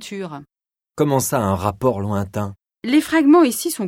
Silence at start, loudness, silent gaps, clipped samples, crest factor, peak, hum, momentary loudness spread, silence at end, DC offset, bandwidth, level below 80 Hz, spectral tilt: 0 s; -18 LUFS; none; under 0.1%; 16 dB; -2 dBFS; none; 18 LU; 0 s; under 0.1%; 17 kHz; -52 dBFS; -5.5 dB/octave